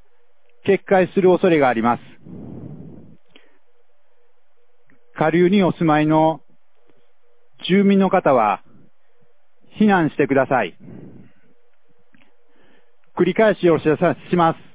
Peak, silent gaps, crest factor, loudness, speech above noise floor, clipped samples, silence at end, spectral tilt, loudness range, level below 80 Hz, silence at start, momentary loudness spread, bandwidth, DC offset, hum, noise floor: -2 dBFS; none; 18 dB; -17 LUFS; 49 dB; under 0.1%; 0.2 s; -11 dB/octave; 6 LU; -56 dBFS; 0.65 s; 20 LU; 4 kHz; 0.7%; none; -66 dBFS